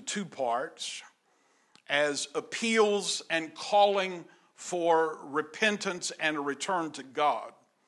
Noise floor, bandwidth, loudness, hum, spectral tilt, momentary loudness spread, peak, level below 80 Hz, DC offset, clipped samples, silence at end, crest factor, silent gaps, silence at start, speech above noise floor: -69 dBFS; 12 kHz; -29 LUFS; none; -2.5 dB/octave; 11 LU; -10 dBFS; under -90 dBFS; under 0.1%; under 0.1%; 0.35 s; 20 dB; none; 0 s; 39 dB